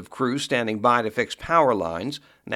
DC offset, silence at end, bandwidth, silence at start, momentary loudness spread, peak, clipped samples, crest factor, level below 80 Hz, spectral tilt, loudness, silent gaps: under 0.1%; 0 s; 15.5 kHz; 0 s; 11 LU; -4 dBFS; under 0.1%; 20 dB; -54 dBFS; -4.5 dB/octave; -23 LUFS; none